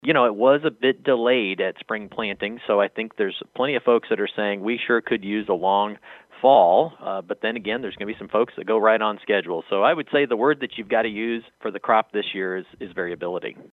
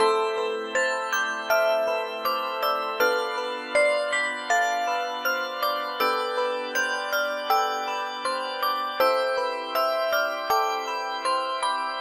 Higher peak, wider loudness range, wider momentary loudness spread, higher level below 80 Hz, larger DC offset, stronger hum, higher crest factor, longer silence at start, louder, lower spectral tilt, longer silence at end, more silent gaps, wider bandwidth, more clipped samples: first, -4 dBFS vs -8 dBFS; about the same, 3 LU vs 1 LU; first, 11 LU vs 5 LU; first, -66 dBFS vs -74 dBFS; neither; neither; about the same, 18 dB vs 16 dB; about the same, 0.05 s vs 0 s; first, -22 LUFS vs -25 LUFS; first, -7.5 dB/octave vs 0 dB/octave; about the same, 0.1 s vs 0 s; neither; second, 4.3 kHz vs 16 kHz; neither